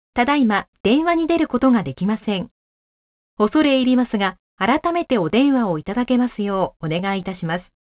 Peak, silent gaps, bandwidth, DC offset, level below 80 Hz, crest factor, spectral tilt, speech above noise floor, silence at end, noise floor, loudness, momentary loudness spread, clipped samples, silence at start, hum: -4 dBFS; 0.68-0.73 s, 0.80-0.84 s, 2.51-3.37 s, 4.39-4.58 s; 4 kHz; under 0.1%; -50 dBFS; 16 dB; -10 dB/octave; over 71 dB; 0.35 s; under -90 dBFS; -19 LUFS; 8 LU; under 0.1%; 0.15 s; none